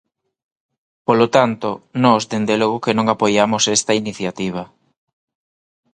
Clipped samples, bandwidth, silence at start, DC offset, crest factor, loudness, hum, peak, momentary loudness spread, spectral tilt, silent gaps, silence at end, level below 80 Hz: under 0.1%; 11 kHz; 1.1 s; under 0.1%; 18 dB; -17 LUFS; none; 0 dBFS; 10 LU; -4 dB/octave; none; 1.3 s; -58 dBFS